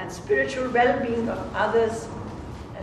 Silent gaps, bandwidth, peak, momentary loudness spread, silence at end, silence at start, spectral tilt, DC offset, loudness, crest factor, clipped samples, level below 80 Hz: none; 12.5 kHz; -8 dBFS; 15 LU; 0 s; 0 s; -5.5 dB/octave; under 0.1%; -24 LUFS; 16 dB; under 0.1%; -46 dBFS